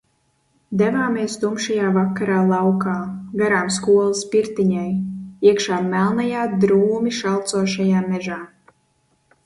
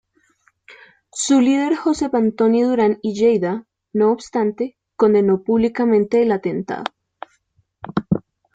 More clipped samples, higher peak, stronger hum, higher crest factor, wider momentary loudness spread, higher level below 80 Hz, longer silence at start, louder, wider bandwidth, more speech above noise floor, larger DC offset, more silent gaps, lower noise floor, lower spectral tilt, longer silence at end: neither; about the same, -2 dBFS vs -2 dBFS; neither; about the same, 16 dB vs 16 dB; second, 8 LU vs 12 LU; about the same, -58 dBFS vs -56 dBFS; second, 0.7 s vs 1.15 s; about the same, -19 LUFS vs -18 LUFS; first, 11.5 kHz vs 9.4 kHz; about the same, 46 dB vs 47 dB; neither; neither; about the same, -65 dBFS vs -63 dBFS; about the same, -5.5 dB/octave vs -6 dB/octave; first, 1 s vs 0.35 s